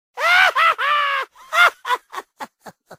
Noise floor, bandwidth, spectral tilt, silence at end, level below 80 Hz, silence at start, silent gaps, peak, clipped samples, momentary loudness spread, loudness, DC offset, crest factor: -43 dBFS; 16 kHz; 1 dB/octave; 0.05 s; -68 dBFS; 0.15 s; none; -2 dBFS; under 0.1%; 22 LU; -16 LUFS; under 0.1%; 18 dB